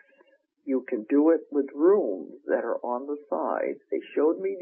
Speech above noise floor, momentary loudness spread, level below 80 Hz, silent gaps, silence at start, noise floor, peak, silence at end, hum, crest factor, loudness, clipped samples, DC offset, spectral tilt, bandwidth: 37 dB; 10 LU; -90 dBFS; none; 0.65 s; -63 dBFS; -10 dBFS; 0 s; none; 16 dB; -26 LUFS; under 0.1%; under 0.1%; -5.5 dB/octave; 3.2 kHz